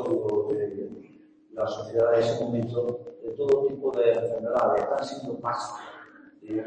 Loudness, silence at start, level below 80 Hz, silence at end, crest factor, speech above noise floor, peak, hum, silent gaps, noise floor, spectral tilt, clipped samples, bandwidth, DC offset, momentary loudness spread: -27 LUFS; 0 s; -66 dBFS; 0 s; 18 dB; 28 dB; -10 dBFS; none; none; -54 dBFS; -6.5 dB/octave; under 0.1%; 8.8 kHz; under 0.1%; 15 LU